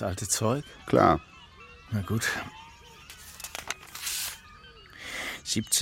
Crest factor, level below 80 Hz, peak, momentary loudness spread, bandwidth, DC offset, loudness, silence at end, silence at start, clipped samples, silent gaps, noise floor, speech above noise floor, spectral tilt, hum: 26 dB; -54 dBFS; -6 dBFS; 25 LU; 16.5 kHz; under 0.1%; -29 LUFS; 0 s; 0 s; under 0.1%; none; -51 dBFS; 24 dB; -3.5 dB/octave; none